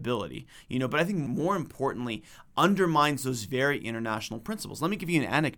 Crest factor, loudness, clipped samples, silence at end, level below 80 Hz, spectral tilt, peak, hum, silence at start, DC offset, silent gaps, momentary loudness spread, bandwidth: 20 dB; -29 LUFS; under 0.1%; 0 s; -58 dBFS; -5 dB/octave; -8 dBFS; none; 0 s; under 0.1%; none; 12 LU; over 20 kHz